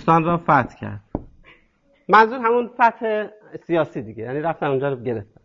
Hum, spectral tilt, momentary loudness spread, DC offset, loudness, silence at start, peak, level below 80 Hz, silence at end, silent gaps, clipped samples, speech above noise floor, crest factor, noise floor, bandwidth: none; -8 dB/octave; 18 LU; under 0.1%; -20 LUFS; 0 s; -2 dBFS; -50 dBFS; 0.2 s; none; under 0.1%; 40 dB; 18 dB; -60 dBFS; 7.4 kHz